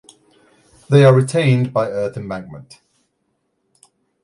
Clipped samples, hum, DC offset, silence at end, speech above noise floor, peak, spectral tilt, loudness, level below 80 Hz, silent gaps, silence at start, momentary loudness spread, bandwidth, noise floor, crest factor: under 0.1%; none; under 0.1%; 1.6 s; 54 dB; 0 dBFS; -7 dB/octave; -16 LUFS; -56 dBFS; none; 0.9 s; 20 LU; 11.5 kHz; -69 dBFS; 18 dB